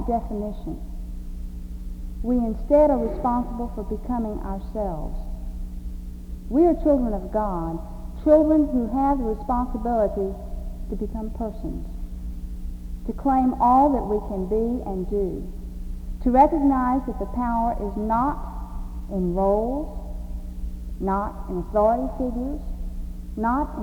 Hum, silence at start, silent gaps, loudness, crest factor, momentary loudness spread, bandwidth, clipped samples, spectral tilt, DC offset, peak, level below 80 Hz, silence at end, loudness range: 60 Hz at -40 dBFS; 0 s; none; -24 LUFS; 20 dB; 18 LU; 20 kHz; under 0.1%; -9.5 dB/octave; under 0.1%; -4 dBFS; -32 dBFS; 0 s; 6 LU